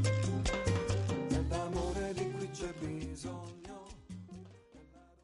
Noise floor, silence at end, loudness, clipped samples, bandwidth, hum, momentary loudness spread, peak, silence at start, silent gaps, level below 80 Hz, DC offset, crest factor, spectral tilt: -58 dBFS; 0.2 s; -36 LUFS; under 0.1%; 11.5 kHz; none; 17 LU; -20 dBFS; 0 s; none; -46 dBFS; under 0.1%; 16 dB; -6 dB/octave